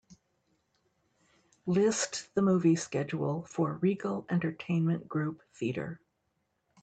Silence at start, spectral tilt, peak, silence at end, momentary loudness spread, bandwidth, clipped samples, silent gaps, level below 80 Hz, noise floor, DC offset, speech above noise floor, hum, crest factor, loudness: 0.1 s; -6 dB/octave; -16 dBFS; 0.85 s; 11 LU; 9 kHz; under 0.1%; none; -72 dBFS; -79 dBFS; under 0.1%; 48 dB; none; 16 dB; -31 LUFS